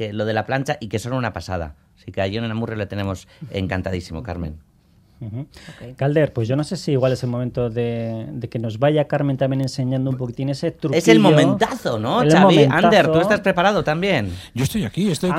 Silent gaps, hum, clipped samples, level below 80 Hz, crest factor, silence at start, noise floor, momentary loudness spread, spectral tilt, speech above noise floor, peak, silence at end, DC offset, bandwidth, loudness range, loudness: none; none; under 0.1%; -48 dBFS; 18 dB; 0 s; -54 dBFS; 17 LU; -6 dB/octave; 35 dB; 0 dBFS; 0 s; under 0.1%; 16 kHz; 12 LU; -19 LUFS